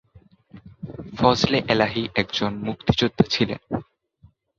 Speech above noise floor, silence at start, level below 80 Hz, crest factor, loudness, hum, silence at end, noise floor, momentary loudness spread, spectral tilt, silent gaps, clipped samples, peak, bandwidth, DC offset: 35 dB; 0.55 s; -46 dBFS; 22 dB; -22 LUFS; none; 0.75 s; -56 dBFS; 15 LU; -5.5 dB/octave; none; under 0.1%; -2 dBFS; 7.6 kHz; under 0.1%